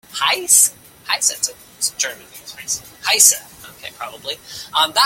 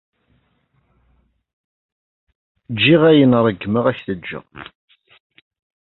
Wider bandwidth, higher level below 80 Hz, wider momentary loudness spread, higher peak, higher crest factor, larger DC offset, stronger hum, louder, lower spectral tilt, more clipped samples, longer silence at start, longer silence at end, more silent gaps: first, 17 kHz vs 4.3 kHz; second, -60 dBFS vs -54 dBFS; about the same, 22 LU vs 21 LU; about the same, 0 dBFS vs -2 dBFS; about the same, 20 dB vs 18 dB; neither; neither; about the same, -16 LUFS vs -15 LUFS; second, 2 dB/octave vs -10.5 dB/octave; neither; second, 0.1 s vs 2.7 s; second, 0 s vs 1.3 s; neither